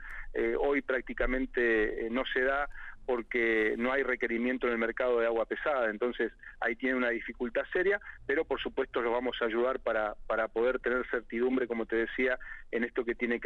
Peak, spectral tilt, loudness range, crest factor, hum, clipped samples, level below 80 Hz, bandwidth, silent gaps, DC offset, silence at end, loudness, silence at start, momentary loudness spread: -16 dBFS; -6 dB/octave; 2 LU; 14 dB; none; under 0.1%; -48 dBFS; 6.6 kHz; none; under 0.1%; 0 s; -31 LUFS; 0 s; 6 LU